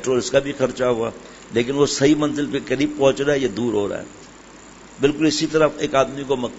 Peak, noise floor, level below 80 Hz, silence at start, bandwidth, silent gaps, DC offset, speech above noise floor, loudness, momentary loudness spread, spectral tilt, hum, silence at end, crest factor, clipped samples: -2 dBFS; -43 dBFS; -48 dBFS; 0 s; 8 kHz; none; under 0.1%; 23 dB; -20 LUFS; 7 LU; -4.5 dB/octave; none; 0 s; 18 dB; under 0.1%